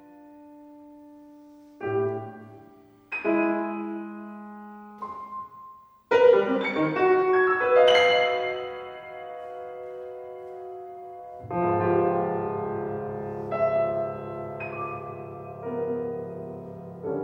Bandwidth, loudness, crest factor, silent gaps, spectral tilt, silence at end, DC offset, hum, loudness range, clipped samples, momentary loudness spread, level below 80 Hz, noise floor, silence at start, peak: 9.4 kHz; -25 LUFS; 20 dB; none; -6 dB/octave; 0 s; under 0.1%; none; 11 LU; under 0.1%; 21 LU; -64 dBFS; -53 dBFS; 0 s; -6 dBFS